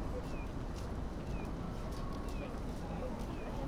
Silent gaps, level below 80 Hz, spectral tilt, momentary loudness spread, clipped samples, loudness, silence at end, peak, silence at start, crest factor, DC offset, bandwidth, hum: none; -44 dBFS; -7 dB/octave; 1 LU; under 0.1%; -43 LUFS; 0 s; -28 dBFS; 0 s; 12 dB; under 0.1%; 15.5 kHz; none